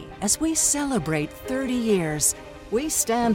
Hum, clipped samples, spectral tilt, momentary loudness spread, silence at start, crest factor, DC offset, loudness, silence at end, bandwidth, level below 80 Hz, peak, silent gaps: none; under 0.1%; -3.5 dB/octave; 8 LU; 0 s; 16 dB; under 0.1%; -23 LUFS; 0 s; 17 kHz; -48 dBFS; -8 dBFS; none